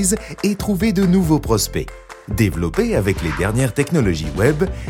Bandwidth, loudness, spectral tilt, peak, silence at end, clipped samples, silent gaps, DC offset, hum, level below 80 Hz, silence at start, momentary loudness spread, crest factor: 17 kHz; -18 LUFS; -5.5 dB/octave; -2 dBFS; 0 s; under 0.1%; none; under 0.1%; none; -30 dBFS; 0 s; 6 LU; 16 dB